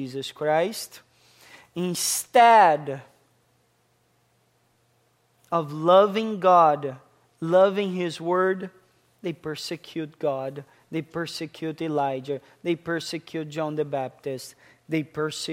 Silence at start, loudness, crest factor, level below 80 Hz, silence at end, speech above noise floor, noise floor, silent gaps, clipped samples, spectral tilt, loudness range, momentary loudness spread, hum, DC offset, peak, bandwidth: 0 s; -24 LUFS; 20 dB; -72 dBFS; 0 s; 43 dB; -66 dBFS; none; under 0.1%; -4.5 dB/octave; 9 LU; 17 LU; none; under 0.1%; -4 dBFS; 16 kHz